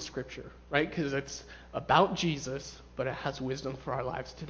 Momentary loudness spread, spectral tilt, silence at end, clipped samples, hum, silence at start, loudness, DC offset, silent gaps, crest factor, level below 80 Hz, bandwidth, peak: 17 LU; -5 dB/octave; 0 s; under 0.1%; none; 0 s; -32 LUFS; under 0.1%; none; 22 dB; -54 dBFS; 8 kHz; -10 dBFS